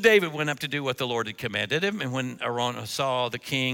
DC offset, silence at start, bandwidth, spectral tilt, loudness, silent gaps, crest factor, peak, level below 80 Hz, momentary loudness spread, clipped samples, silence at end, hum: under 0.1%; 0 s; 17 kHz; -4 dB/octave; -27 LUFS; none; 22 dB; -4 dBFS; -66 dBFS; 5 LU; under 0.1%; 0 s; none